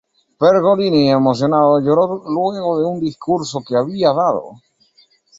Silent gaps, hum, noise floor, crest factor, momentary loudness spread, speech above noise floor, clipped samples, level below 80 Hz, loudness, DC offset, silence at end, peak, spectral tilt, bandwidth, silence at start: none; none; -55 dBFS; 14 dB; 7 LU; 40 dB; under 0.1%; -58 dBFS; -16 LUFS; under 0.1%; 0.85 s; -2 dBFS; -6.5 dB/octave; 8 kHz; 0.4 s